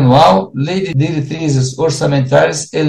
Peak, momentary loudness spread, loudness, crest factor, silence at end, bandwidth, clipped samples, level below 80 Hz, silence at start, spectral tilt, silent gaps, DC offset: 0 dBFS; 8 LU; -13 LUFS; 12 dB; 0 s; 10.5 kHz; under 0.1%; -44 dBFS; 0 s; -6 dB/octave; none; under 0.1%